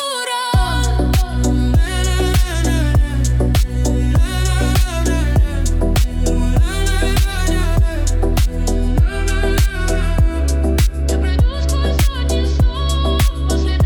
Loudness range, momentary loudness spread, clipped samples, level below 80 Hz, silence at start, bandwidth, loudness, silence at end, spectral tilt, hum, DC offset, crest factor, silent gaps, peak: 1 LU; 2 LU; under 0.1%; -16 dBFS; 0 s; 18 kHz; -17 LUFS; 0 s; -5.5 dB/octave; none; under 0.1%; 10 dB; none; -4 dBFS